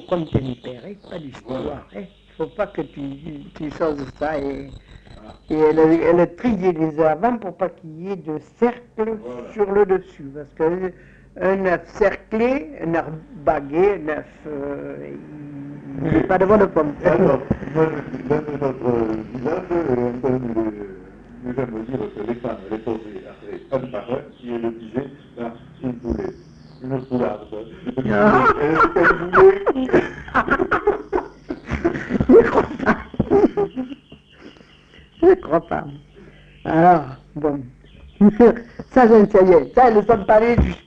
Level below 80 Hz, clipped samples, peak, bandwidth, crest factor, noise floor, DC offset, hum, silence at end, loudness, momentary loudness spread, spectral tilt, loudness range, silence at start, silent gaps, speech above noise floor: -40 dBFS; under 0.1%; -2 dBFS; 7.6 kHz; 18 dB; -48 dBFS; under 0.1%; none; 0.1 s; -19 LUFS; 20 LU; -8.5 dB/octave; 12 LU; 0 s; none; 29 dB